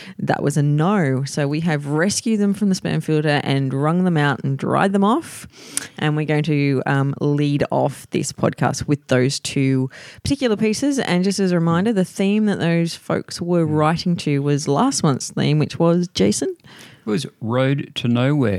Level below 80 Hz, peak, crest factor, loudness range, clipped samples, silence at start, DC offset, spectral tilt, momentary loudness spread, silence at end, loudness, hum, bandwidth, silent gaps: -54 dBFS; -2 dBFS; 16 dB; 1 LU; under 0.1%; 0 s; under 0.1%; -6 dB/octave; 6 LU; 0 s; -19 LUFS; none; 14.5 kHz; none